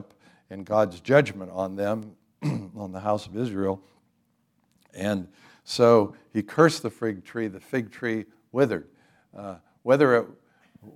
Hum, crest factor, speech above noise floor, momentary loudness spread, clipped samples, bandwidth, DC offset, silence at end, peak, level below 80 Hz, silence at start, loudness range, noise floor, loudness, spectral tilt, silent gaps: none; 24 dB; 45 dB; 17 LU; under 0.1%; 14.5 kHz; under 0.1%; 0.05 s; -4 dBFS; -72 dBFS; 0.5 s; 7 LU; -70 dBFS; -25 LUFS; -6 dB/octave; none